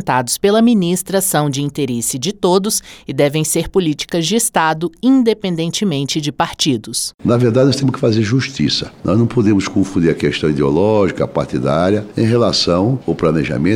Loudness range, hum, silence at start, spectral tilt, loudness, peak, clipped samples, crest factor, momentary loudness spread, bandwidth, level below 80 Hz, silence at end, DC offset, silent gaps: 1 LU; none; 0 s; -5 dB/octave; -15 LUFS; -2 dBFS; under 0.1%; 14 dB; 5 LU; over 20 kHz; -42 dBFS; 0 s; under 0.1%; 7.14-7.18 s